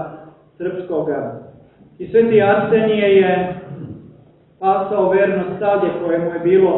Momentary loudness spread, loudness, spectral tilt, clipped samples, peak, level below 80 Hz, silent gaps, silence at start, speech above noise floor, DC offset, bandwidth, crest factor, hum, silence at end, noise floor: 18 LU; -17 LUFS; -11 dB/octave; under 0.1%; -2 dBFS; -56 dBFS; none; 0 s; 32 dB; under 0.1%; 4.1 kHz; 14 dB; none; 0 s; -48 dBFS